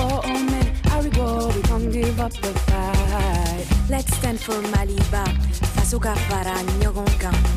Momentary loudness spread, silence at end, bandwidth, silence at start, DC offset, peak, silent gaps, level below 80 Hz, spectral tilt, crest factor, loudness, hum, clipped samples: 3 LU; 0 s; 16 kHz; 0 s; under 0.1%; -8 dBFS; none; -22 dBFS; -5.5 dB/octave; 12 dB; -22 LUFS; none; under 0.1%